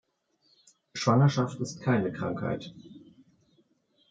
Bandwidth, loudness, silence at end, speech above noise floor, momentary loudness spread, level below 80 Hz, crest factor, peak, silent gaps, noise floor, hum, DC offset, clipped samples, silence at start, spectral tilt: 7.8 kHz; -28 LUFS; 1.15 s; 44 dB; 18 LU; -68 dBFS; 20 dB; -10 dBFS; none; -71 dBFS; none; under 0.1%; under 0.1%; 0.95 s; -6.5 dB/octave